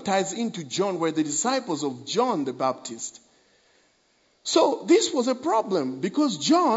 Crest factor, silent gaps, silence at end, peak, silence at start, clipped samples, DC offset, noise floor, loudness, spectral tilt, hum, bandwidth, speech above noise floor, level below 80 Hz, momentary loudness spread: 18 dB; none; 0 s; -8 dBFS; 0 s; under 0.1%; under 0.1%; -65 dBFS; -25 LUFS; -3.5 dB/octave; none; 8 kHz; 41 dB; -78 dBFS; 9 LU